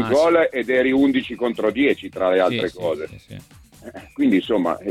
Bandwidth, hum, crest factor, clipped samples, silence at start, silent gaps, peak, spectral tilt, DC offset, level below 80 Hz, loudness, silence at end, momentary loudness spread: 13 kHz; none; 16 dB; under 0.1%; 0 s; none; -4 dBFS; -6 dB/octave; under 0.1%; -54 dBFS; -20 LUFS; 0 s; 17 LU